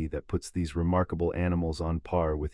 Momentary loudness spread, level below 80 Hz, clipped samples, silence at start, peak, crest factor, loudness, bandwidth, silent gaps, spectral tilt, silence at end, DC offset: 5 LU; -42 dBFS; under 0.1%; 0 s; -14 dBFS; 14 dB; -30 LUFS; 11.5 kHz; none; -7.5 dB/octave; 0.05 s; under 0.1%